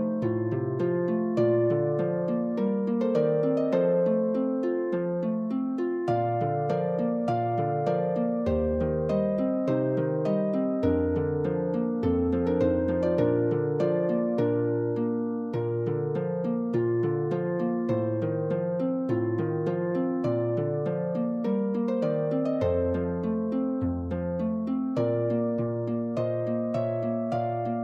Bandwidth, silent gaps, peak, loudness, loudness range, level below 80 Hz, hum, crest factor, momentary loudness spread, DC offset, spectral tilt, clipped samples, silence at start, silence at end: 7 kHz; none; -12 dBFS; -27 LUFS; 2 LU; -52 dBFS; none; 14 dB; 4 LU; under 0.1%; -10.5 dB/octave; under 0.1%; 0 s; 0 s